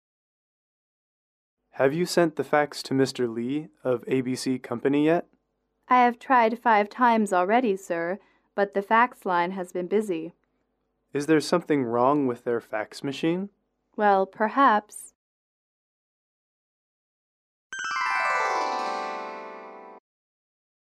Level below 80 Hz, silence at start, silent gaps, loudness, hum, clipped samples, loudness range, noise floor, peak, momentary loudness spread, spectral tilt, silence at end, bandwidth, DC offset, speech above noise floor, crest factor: -76 dBFS; 1.75 s; 15.15-17.70 s; -25 LUFS; none; under 0.1%; 6 LU; -75 dBFS; -8 dBFS; 13 LU; -5 dB/octave; 1 s; 15 kHz; under 0.1%; 51 dB; 20 dB